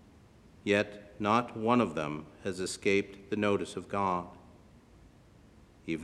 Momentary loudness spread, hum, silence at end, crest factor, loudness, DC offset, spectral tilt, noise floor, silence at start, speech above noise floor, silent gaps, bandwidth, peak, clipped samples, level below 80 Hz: 11 LU; none; 0 s; 22 dB; -32 LUFS; under 0.1%; -5 dB/octave; -58 dBFS; 0.65 s; 27 dB; none; 12.5 kHz; -12 dBFS; under 0.1%; -62 dBFS